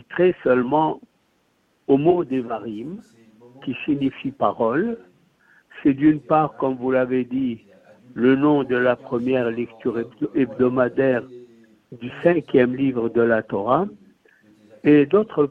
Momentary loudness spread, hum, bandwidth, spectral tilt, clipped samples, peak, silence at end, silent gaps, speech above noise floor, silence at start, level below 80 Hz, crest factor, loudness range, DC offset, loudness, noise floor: 14 LU; none; 4.4 kHz; -9.5 dB/octave; under 0.1%; -4 dBFS; 0 s; none; 45 dB; 0.1 s; -58 dBFS; 18 dB; 4 LU; under 0.1%; -21 LUFS; -65 dBFS